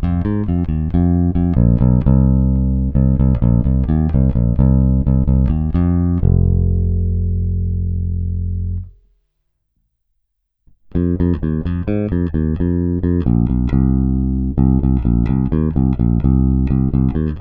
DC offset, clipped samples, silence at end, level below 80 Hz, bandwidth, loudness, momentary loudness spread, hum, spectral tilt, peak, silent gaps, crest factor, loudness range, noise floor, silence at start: under 0.1%; under 0.1%; 0 s; -20 dBFS; 3.6 kHz; -16 LUFS; 6 LU; none; -13 dB/octave; -2 dBFS; none; 14 dB; 9 LU; -69 dBFS; 0 s